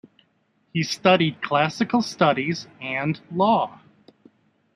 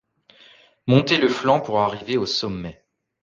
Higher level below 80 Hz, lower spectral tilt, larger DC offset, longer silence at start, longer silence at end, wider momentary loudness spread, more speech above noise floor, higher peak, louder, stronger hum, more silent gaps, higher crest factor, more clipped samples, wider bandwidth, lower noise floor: second, -66 dBFS vs -54 dBFS; about the same, -5.5 dB/octave vs -6 dB/octave; neither; about the same, 0.75 s vs 0.85 s; first, 1 s vs 0.5 s; second, 10 LU vs 15 LU; first, 45 dB vs 32 dB; about the same, -2 dBFS vs -4 dBFS; about the same, -22 LUFS vs -20 LUFS; neither; neither; about the same, 22 dB vs 18 dB; neither; first, 14 kHz vs 7.6 kHz; first, -66 dBFS vs -53 dBFS